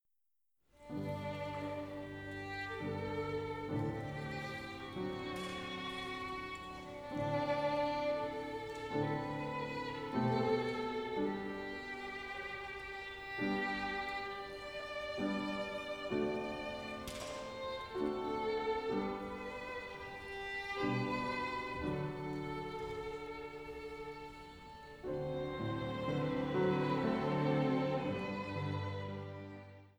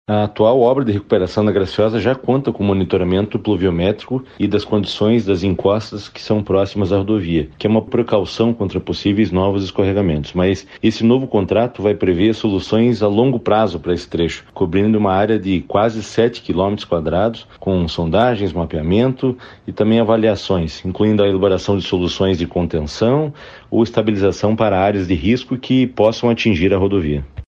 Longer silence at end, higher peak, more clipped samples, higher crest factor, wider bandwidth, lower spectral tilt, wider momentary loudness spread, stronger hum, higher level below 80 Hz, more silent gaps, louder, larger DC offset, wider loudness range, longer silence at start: about the same, 0.1 s vs 0.05 s; second, -22 dBFS vs -2 dBFS; neither; about the same, 18 dB vs 14 dB; first, over 20 kHz vs 7.8 kHz; about the same, -6.5 dB/octave vs -7.5 dB/octave; first, 11 LU vs 6 LU; neither; second, -62 dBFS vs -40 dBFS; neither; second, -40 LUFS vs -17 LUFS; neither; first, 6 LU vs 2 LU; first, 0.8 s vs 0.1 s